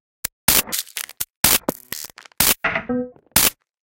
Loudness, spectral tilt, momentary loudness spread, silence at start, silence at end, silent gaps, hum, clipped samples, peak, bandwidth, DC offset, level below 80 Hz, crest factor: -18 LUFS; -1 dB/octave; 15 LU; 0.5 s; 0.3 s; 1.36-1.43 s; none; under 0.1%; 0 dBFS; 17.5 kHz; under 0.1%; -44 dBFS; 22 dB